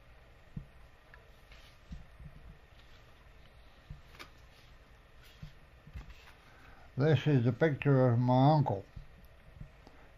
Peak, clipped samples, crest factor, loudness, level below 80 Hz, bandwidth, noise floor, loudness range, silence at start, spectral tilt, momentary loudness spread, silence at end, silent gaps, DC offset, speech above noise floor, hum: -14 dBFS; under 0.1%; 20 dB; -29 LUFS; -56 dBFS; 6.8 kHz; -57 dBFS; 25 LU; 0.55 s; -9 dB/octave; 27 LU; 0.5 s; none; under 0.1%; 30 dB; none